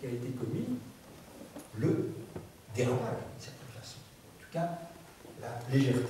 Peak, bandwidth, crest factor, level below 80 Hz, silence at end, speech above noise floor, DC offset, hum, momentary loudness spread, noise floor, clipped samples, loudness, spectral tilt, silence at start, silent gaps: -16 dBFS; 15.5 kHz; 20 dB; -66 dBFS; 0 s; 22 dB; under 0.1%; none; 19 LU; -54 dBFS; under 0.1%; -36 LUFS; -7 dB/octave; 0 s; none